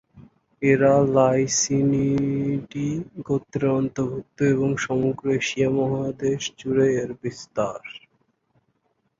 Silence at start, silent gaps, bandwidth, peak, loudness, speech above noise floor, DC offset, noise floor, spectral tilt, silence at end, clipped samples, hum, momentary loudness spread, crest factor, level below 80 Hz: 0.15 s; none; 7.8 kHz; -6 dBFS; -23 LUFS; 48 dB; under 0.1%; -70 dBFS; -5.5 dB/octave; 1.2 s; under 0.1%; none; 11 LU; 18 dB; -56 dBFS